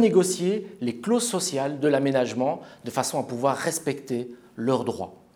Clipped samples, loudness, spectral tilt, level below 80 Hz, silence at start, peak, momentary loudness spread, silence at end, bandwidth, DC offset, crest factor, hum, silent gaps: under 0.1%; -26 LUFS; -4.5 dB/octave; -72 dBFS; 0 s; -6 dBFS; 10 LU; 0.2 s; 20 kHz; under 0.1%; 18 dB; none; none